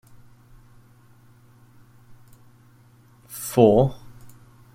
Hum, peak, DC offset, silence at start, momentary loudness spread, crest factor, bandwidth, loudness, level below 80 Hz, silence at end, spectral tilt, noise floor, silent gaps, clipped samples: none; -2 dBFS; under 0.1%; 3.35 s; 24 LU; 24 dB; 16.5 kHz; -19 LUFS; -50 dBFS; 0.8 s; -7 dB/octave; -54 dBFS; none; under 0.1%